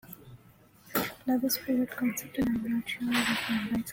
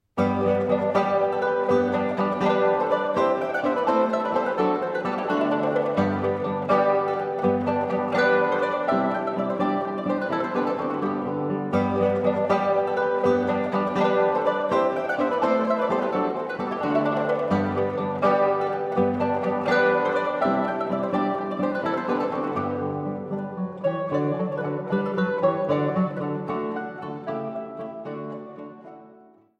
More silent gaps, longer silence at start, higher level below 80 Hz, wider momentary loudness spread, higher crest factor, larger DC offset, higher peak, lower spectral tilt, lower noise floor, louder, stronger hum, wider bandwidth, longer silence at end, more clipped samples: neither; about the same, 0.05 s vs 0.15 s; first, -58 dBFS vs -64 dBFS; about the same, 5 LU vs 7 LU; about the same, 16 dB vs 16 dB; neither; second, -14 dBFS vs -8 dBFS; second, -3.5 dB/octave vs -7.5 dB/octave; first, -58 dBFS vs -52 dBFS; second, -30 LUFS vs -24 LUFS; neither; first, 17 kHz vs 8.2 kHz; second, 0 s vs 0.45 s; neither